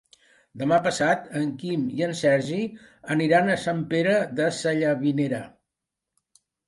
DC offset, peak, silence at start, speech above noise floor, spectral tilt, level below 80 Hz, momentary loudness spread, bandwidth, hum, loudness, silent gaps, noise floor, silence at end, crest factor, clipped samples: under 0.1%; -6 dBFS; 0.55 s; 62 dB; -5.5 dB/octave; -66 dBFS; 8 LU; 11.5 kHz; none; -24 LUFS; none; -85 dBFS; 1.2 s; 18 dB; under 0.1%